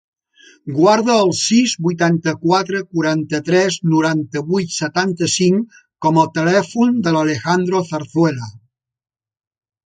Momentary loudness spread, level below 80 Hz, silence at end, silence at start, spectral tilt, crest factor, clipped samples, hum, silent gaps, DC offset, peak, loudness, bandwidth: 7 LU; -60 dBFS; 1.3 s; 0.65 s; -5 dB/octave; 16 dB; under 0.1%; none; none; under 0.1%; 0 dBFS; -16 LUFS; 9.4 kHz